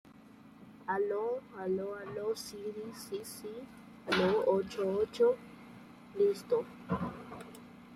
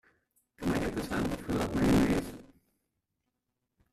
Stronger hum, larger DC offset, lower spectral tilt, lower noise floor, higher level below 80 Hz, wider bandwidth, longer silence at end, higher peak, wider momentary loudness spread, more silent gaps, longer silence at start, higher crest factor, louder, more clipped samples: neither; neither; about the same, -5.5 dB/octave vs -6 dB/octave; second, -56 dBFS vs -84 dBFS; second, -68 dBFS vs -48 dBFS; about the same, 14.5 kHz vs 14.5 kHz; second, 0 s vs 1.5 s; about the same, -16 dBFS vs -16 dBFS; first, 21 LU vs 11 LU; neither; second, 0.05 s vs 0.6 s; about the same, 18 dB vs 18 dB; second, -34 LUFS vs -31 LUFS; neither